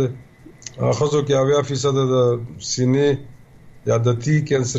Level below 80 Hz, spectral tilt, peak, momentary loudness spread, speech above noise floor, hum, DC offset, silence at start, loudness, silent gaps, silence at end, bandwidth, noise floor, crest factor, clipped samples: -52 dBFS; -6 dB/octave; -8 dBFS; 10 LU; 26 dB; none; under 0.1%; 0 s; -19 LUFS; none; 0 s; 8.2 kHz; -44 dBFS; 12 dB; under 0.1%